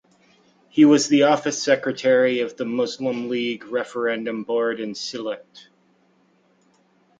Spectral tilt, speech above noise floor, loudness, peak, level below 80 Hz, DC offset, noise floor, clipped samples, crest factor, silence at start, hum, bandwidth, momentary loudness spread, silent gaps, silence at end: -4 dB/octave; 40 dB; -21 LUFS; -2 dBFS; -70 dBFS; under 0.1%; -61 dBFS; under 0.1%; 20 dB; 0.75 s; none; 9.2 kHz; 13 LU; none; 1.8 s